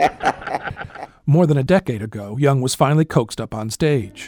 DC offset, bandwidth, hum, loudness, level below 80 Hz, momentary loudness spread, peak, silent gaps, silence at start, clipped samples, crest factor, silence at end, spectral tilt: under 0.1%; 19 kHz; none; -19 LUFS; -46 dBFS; 12 LU; -2 dBFS; none; 0 s; under 0.1%; 16 dB; 0 s; -6.5 dB/octave